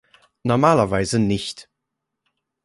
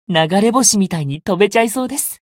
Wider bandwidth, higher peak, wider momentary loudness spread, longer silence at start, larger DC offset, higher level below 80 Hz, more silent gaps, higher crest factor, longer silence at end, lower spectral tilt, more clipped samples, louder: second, 11.5 kHz vs 16.5 kHz; about the same, -2 dBFS vs 0 dBFS; first, 14 LU vs 9 LU; first, 0.45 s vs 0.1 s; neither; first, -48 dBFS vs -54 dBFS; neither; about the same, 20 dB vs 16 dB; first, 1 s vs 0.15 s; first, -6 dB/octave vs -3.5 dB/octave; neither; second, -19 LUFS vs -15 LUFS